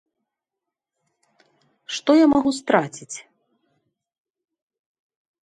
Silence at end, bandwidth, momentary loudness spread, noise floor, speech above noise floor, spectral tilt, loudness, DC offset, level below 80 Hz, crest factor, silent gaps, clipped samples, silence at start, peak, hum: 2.2 s; 11 kHz; 20 LU; -86 dBFS; 67 dB; -4.5 dB/octave; -19 LUFS; under 0.1%; -62 dBFS; 22 dB; none; under 0.1%; 1.9 s; -2 dBFS; none